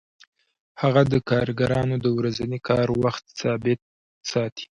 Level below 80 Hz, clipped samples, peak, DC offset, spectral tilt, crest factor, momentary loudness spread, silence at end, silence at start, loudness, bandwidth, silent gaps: -50 dBFS; under 0.1%; -4 dBFS; under 0.1%; -6.5 dB/octave; 20 dB; 8 LU; 0.15 s; 0.75 s; -23 LUFS; 9 kHz; 3.82-4.21 s, 4.52-4.56 s